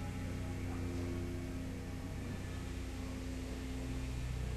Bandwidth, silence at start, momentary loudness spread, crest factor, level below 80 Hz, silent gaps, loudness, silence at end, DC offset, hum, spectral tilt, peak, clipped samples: 13 kHz; 0 s; 3 LU; 12 dB; -46 dBFS; none; -43 LUFS; 0 s; under 0.1%; none; -6 dB/octave; -28 dBFS; under 0.1%